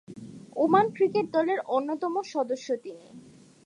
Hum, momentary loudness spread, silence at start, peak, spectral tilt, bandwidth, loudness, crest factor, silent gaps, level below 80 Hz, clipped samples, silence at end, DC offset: none; 21 LU; 0.1 s; -8 dBFS; -6 dB/octave; 10.5 kHz; -27 LUFS; 18 dB; none; -76 dBFS; under 0.1%; 0.45 s; under 0.1%